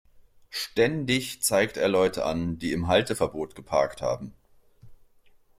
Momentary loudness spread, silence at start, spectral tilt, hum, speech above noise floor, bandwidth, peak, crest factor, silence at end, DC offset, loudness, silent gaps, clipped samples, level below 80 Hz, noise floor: 10 LU; 0.5 s; -4 dB/octave; none; 32 dB; 16.5 kHz; -8 dBFS; 18 dB; 0.65 s; under 0.1%; -26 LUFS; none; under 0.1%; -54 dBFS; -58 dBFS